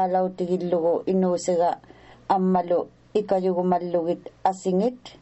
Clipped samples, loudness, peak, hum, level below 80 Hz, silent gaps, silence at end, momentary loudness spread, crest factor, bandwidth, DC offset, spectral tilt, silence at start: under 0.1%; -24 LUFS; -6 dBFS; none; -62 dBFS; none; 0.1 s; 6 LU; 16 dB; 8.2 kHz; under 0.1%; -7 dB/octave; 0 s